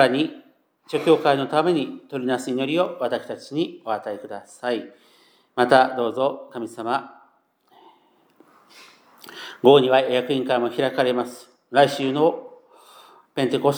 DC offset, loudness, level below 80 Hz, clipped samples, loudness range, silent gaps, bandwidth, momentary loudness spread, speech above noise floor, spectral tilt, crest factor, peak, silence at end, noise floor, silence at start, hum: under 0.1%; -22 LUFS; -82 dBFS; under 0.1%; 7 LU; none; over 20 kHz; 16 LU; 40 dB; -5.5 dB/octave; 22 dB; -2 dBFS; 0 s; -61 dBFS; 0 s; none